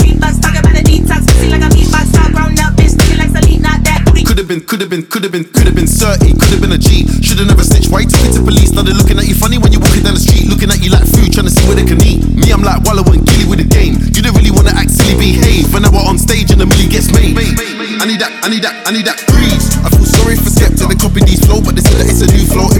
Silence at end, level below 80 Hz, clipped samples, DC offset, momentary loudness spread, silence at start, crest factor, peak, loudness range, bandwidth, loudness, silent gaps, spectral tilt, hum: 0 s; -10 dBFS; 2%; under 0.1%; 5 LU; 0 s; 8 dB; 0 dBFS; 2 LU; 19.5 kHz; -9 LUFS; none; -5 dB/octave; none